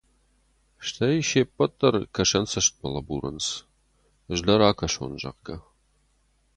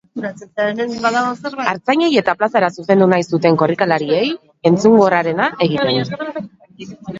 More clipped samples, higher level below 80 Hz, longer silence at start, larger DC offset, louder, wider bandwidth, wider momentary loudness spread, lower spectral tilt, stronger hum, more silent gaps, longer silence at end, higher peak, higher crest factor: neither; first, -48 dBFS vs -58 dBFS; first, 0.8 s vs 0.15 s; neither; second, -24 LUFS vs -16 LUFS; first, 11 kHz vs 7.8 kHz; about the same, 15 LU vs 14 LU; second, -3.5 dB/octave vs -6 dB/octave; neither; neither; first, 0.95 s vs 0 s; second, -4 dBFS vs 0 dBFS; first, 24 dB vs 16 dB